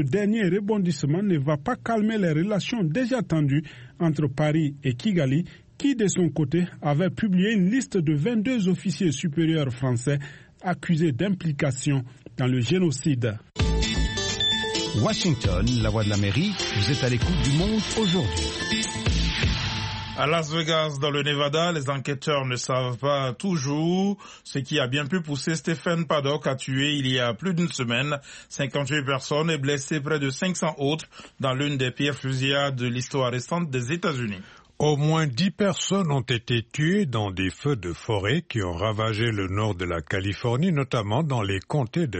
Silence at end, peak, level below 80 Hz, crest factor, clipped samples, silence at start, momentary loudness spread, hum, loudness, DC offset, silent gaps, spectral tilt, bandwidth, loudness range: 0 s; -10 dBFS; -40 dBFS; 14 dB; under 0.1%; 0 s; 5 LU; none; -25 LUFS; under 0.1%; none; -5.5 dB/octave; 8.8 kHz; 2 LU